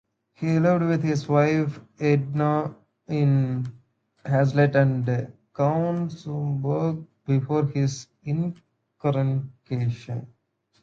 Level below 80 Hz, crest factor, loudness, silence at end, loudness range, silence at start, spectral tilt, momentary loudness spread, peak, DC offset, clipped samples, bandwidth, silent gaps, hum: -62 dBFS; 18 dB; -24 LUFS; 0.55 s; 4 LU; 0.4 s; -8 dB/octave; 11 LU; -6 dBFS; under 0.1%; under 0.1%; 7.4 kHz; none; none